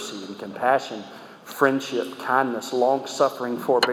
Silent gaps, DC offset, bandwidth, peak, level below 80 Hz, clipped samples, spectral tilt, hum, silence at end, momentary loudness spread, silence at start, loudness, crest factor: none; under 0.1%; over 20 kHz; -4 dBFS; -80 dBFS; under 0.1%; -4 dB/octave; none; 0 s; 14 LU; 0 s; -23 LUFS; 20 dB